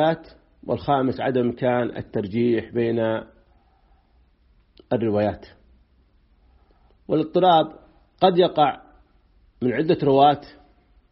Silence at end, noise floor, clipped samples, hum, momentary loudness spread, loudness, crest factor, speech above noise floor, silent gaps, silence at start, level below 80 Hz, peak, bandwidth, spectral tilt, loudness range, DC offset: 0.6 s; -59 dBFS; under 0.1%; none; 12 LU; -22 LUFS; 20 dB; 39 dB; none; 0 s; -56 dBFS; -4 dBFS; 5.8 kHz; -5 dB/octave; 9 LU; under 0.1%